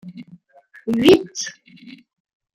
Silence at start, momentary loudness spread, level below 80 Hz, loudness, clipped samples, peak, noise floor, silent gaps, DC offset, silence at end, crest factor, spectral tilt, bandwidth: 0.05 s; 19 LU; -56 dBFS; -17 LUFS; under 0.1%; -2 dBFS; -50 dBFS; none; under 0.1%; 0.65 s; 20 dB; -4.5 dB/octave; 15.5 kHz